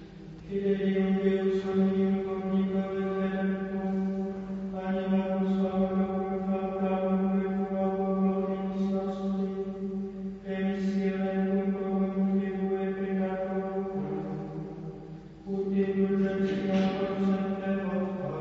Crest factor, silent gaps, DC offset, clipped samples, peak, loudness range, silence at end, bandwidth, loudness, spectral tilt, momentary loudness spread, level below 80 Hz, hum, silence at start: 14 dB; none; under 0.1%; under 0.1%; -14 dBFS; 3 LU; 0 s; 6 kHz; -30 LUFS; -9 dB/octave; 9 LU; -56 dBFS; none; 0 s